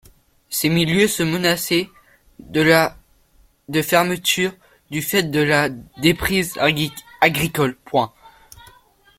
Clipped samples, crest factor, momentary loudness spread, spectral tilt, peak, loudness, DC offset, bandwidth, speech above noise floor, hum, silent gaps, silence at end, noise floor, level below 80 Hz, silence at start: under 0.1%; 20 dB; 8 LU; -4 dB/octave; 0 dBFS; -19 LUFS; under 0.1%; 16.5 kHz; 37 dB; none; none; 0.9 s; -56 dBFS; -48 dBFS; 0.5 s